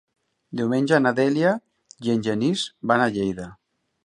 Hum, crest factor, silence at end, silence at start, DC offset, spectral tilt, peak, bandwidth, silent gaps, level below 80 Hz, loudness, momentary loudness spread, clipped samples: none; 20 dB; 0.5 s; 0.5 s; under 0.1%; -6 dB/octave; -4 dBFS; 11.5 kHz; none; -60 dBFS; -22 LUFS; 11 LU; under 0.1%